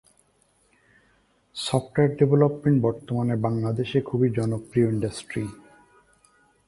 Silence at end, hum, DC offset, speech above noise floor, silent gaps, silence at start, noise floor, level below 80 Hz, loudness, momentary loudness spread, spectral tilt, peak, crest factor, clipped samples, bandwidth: 1.15 s; none; under 0.1%; 42 dB; none; 1.55 s; -65 dBFS; -56 dBFS; -24 LUFS; 12 LU; -7.5 dB/octave; -6 dBFS; 20 dB; under 0.1%; 11.5 kHz